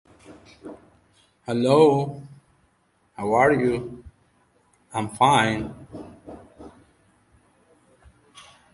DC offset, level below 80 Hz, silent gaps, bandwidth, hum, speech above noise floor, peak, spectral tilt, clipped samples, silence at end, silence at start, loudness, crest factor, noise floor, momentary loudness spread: under 0.1%; -56 dBFS; none; 11.5 kHz; none; 45 dB; -4 dBFS; -5.5 dB/octave; under 0.1%; 2.05 s; 0.3 s; -21 LUFS; 22 dB; -65 dBFS; 27 LU